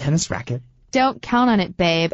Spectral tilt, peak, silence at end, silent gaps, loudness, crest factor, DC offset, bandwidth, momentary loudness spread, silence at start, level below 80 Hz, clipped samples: -5 dB/octave; -4 dBFS; 0.05 s; none; -20 LUFS; 14 dB; under 0.1%; 8.2 kHz; 11 LU; 0 s; -46 dBFS; under 0.1%